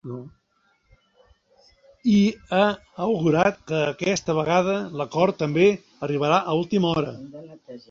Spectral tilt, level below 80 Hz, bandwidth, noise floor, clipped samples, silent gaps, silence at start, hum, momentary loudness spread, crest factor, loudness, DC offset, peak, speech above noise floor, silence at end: -6 dB/octave; -58 dBFS; 7.6 kHz; -67 dBFS; under 0.1%; none; 0.05 s; none; 17 LU; 18 dB; -22 LUFS; under 0.1%; -4 dBFS; 44 dB; 0.1 s